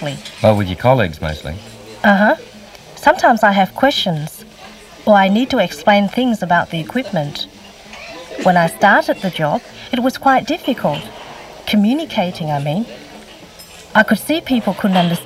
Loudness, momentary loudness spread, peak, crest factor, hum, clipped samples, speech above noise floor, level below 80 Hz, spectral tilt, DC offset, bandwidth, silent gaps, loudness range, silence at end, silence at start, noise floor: -15 LUFS; 20 LU; 0 dBFS; 16 dB; none; under 0.1%; 23 dB; -44 dBFS; -5.5 dB/octave; under 0.1%; 16 kHz; none; 3 LU; 0 s; 0 s; -38 dBFS